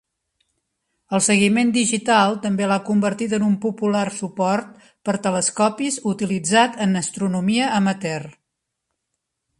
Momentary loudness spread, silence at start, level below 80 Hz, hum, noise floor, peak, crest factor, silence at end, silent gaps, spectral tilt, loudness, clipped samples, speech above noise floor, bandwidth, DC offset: 8 LU; 1.1 s; -62 dBFS; none; -79 dBFS; -2 dBFS; 18 dB; 1.3 s; none; -4 dB/octave; -20 LUFS; under 0.1%; 59 dB; 11.5 kHz; under 0.1%